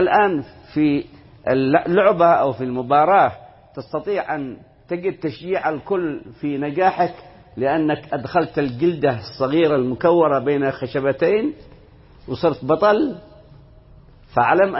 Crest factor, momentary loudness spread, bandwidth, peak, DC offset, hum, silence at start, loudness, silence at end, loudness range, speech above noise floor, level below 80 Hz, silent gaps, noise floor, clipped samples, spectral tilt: 18 dB; 12 LU; 5.8 kHz; -2 dBFS; under 0.1%; none; 0 s; -19 LUFS; 0 s; 6 LU; 28 dB; -52 dBFS; none; -46 dBFS; under 0.1%; -11 dB/octave